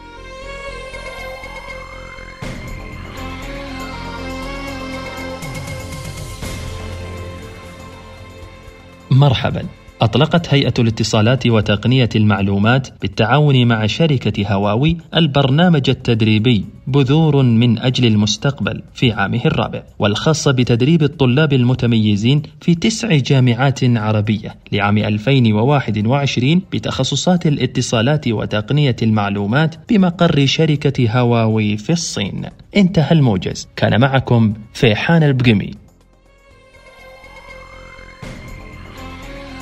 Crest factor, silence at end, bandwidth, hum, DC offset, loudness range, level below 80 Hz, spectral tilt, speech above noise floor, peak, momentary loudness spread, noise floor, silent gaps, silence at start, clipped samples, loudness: 16 dB; 0 s; 12.5 kHz; none; under 0.1%; 14 LU; -40 dBFS; -6 dB/octave; 35 dB; 0 dBFS; 18 LU; -49 dBFS; none; 0 s; under 0.1%; -15 LUFS